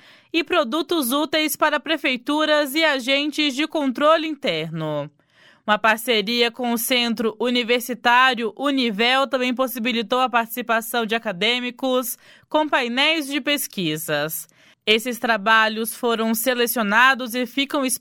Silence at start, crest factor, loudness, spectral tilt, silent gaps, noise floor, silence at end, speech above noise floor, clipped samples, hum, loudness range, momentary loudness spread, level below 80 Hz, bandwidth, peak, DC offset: 0.35 s; 18 dB; -20 LUFS; -2.5 dB/octave; none; -55 dBFS; 0.05 s; 34 dB; under 0.1%; none; 2 LU; 8 LU; -66 dBFS; 17.5 kHz; -2 dBFS; under 0.1%